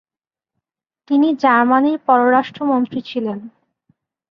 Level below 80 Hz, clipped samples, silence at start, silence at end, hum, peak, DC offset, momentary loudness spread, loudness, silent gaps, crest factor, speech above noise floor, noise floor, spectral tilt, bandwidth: -66 dBFS; under 0.1%; 1.1 s; 0.8 s; none; -2 dBFS; under 0.1%; 11 LU; -16 LUFS; none; 16 dB; over 74 dB; under -90 dBFS; -7 dB/octave; 6.4 kHz